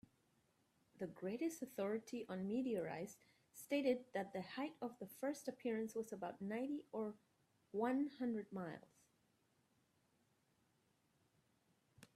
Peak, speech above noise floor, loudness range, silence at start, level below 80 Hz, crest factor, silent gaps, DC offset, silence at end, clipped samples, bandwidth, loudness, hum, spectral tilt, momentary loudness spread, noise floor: -28 dBFS; 36 dB; 3 LU; 0.95 s; -88 dBFS; 20 dB; none; under 0.1%; 0.1 s; under 0.1%; 15.5 kHz; -45 LUFS; none; -5.5 dB/octave; 11 LU; -81 dBFS